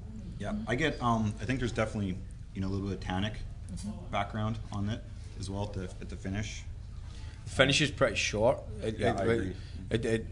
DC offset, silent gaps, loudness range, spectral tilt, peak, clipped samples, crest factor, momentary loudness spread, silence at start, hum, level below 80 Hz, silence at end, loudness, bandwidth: under 0.1%; none; 7 LU; -5 dB/octave; -8 dBFS; under 0.1%; 24 dB; 15 LU; 0 s; none; -44 dBFS; 0 s; -32 LUFS; 11 kHz